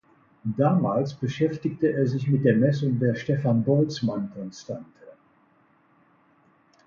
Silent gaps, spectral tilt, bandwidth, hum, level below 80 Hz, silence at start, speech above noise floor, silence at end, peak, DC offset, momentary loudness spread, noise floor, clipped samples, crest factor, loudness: none; -8.5 dB/octave; 7.2 kHz; none; -62 dBFS; 0.45 s; 38 dB; 1.75 s; -6 dBFS; under 0.1%; 14 LU; -62 dBFS; under 0.1%; 18 dB; -24 LUFS